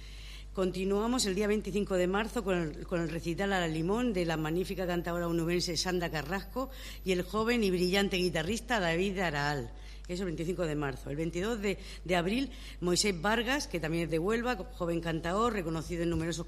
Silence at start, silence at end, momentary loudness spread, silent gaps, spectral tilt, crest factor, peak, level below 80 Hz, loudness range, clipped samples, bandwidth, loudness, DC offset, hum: 0 s; 0 s; 8 LU; none; -4.5 dB/octave; 18 dB; -14 dBFS; -46 dBFS; 2 LU; under 0.1%; 15 kHz; -32 LUFS; under 0.1%; none